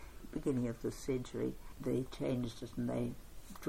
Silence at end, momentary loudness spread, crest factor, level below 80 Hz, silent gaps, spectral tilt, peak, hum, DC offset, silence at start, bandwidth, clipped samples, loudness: 0 s; 7 LU; 16 dB; -54 dBFS; none; -7 dB/octave; -24 dBFS; none; under 0.1%; 0 s; 16.5 kHz; under 0.1%; -40 LUFS